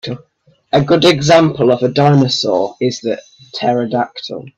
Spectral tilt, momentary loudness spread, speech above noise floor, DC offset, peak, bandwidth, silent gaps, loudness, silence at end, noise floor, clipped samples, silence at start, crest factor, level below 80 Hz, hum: -5.5 dB/octave; 15 LU; 42 dB; under 0.1%; 0 dBFS; 10.5 kHz; none; -13 LUFS; 0.1 s; -55 dBFS; under 0.1%; 0.05 s; 14 dB; -50 dBFS; none